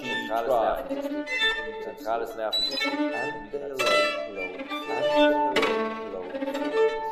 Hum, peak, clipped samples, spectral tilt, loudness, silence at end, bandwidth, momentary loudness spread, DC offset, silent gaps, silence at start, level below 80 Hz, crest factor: none; -10 dBFS; under 0.1%; -3 dB/octave; -26 LUFS; 0 s; 15.5 kHz; 12 LU; under 0.1%; none; 0 s; -54 dBFS; 16 dB